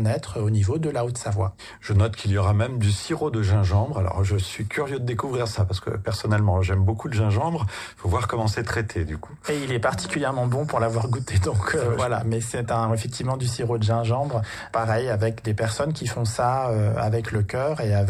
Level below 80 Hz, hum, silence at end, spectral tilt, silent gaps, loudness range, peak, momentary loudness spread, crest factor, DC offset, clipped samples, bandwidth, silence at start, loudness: -44 dBFS; none; 0 s; -6 dB/octave; none; 2 LU; -8 dBFS; 5 LU; 14 dB; under 0.1%; under 0.1%; 12 kHz; 0 s; -24 LUFS